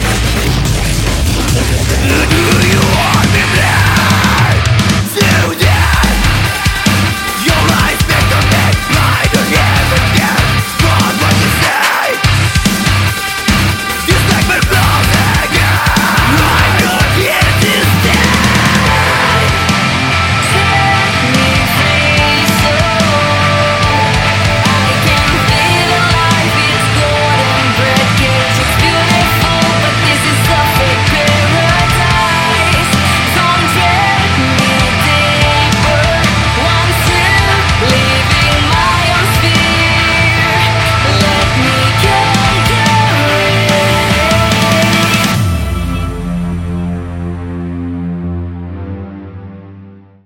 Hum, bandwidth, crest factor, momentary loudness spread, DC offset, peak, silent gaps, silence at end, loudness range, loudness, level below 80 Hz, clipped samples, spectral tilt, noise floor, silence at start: none; 17 kHz; 10 dB; 4 LU; under 0.1%; 0 dBFS; none; 0.3 s; 2 LU; -10 LUFS; -22 dBFS; under 0.1%; -4 dB/octave; -35 dBFS; 0 s